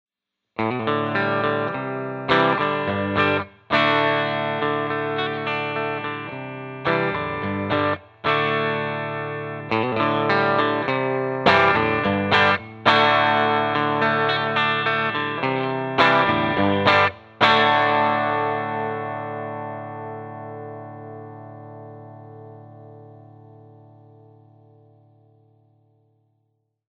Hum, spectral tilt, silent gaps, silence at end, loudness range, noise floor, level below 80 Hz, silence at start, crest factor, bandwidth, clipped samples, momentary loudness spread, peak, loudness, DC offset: none; -6.5 dB/octave; none; 3.65 s; 15 LU; -83 dBFS; -58 dBFS; 0.6 s; 22 dB; 8.4 kHz; under 0.1%; 18 LU; 0 dBFS; -21 LUFS; under 0.1%